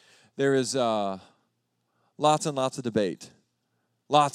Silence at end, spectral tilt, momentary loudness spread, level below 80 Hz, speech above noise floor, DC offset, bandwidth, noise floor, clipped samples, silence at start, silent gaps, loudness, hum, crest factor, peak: 0.05 s; -4.5 dB/octave; 13 LU; -78 dBFS; 51 dB; under 0.1%; 14 kHz; -76 dBFS; under 0.1%; 0.4 s; none; -26 LUFS; none; 22 dB; -6 dBFS